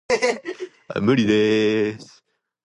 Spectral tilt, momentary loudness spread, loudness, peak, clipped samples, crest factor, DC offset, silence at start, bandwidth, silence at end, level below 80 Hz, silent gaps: -5.5 dB/octave; 16 LU; -20 LUFS; -6 dBFS; under 0.1%; 16 dB; under 0.1%; 0.1 s; 11 kHz; 0.6 s; -56 dBFS; none